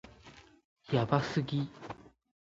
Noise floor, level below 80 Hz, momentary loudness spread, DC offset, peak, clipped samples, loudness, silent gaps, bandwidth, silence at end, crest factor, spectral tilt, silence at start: -57 dBFS; -64 dBFS; 24 LU; under 0.1%; -12 dBFS; under 0.1%; -33 LUFS; 0.65-0.76 s; 7.8 kHz; 0.4 s; 24 dB; -7 dB/octave; 0.05 s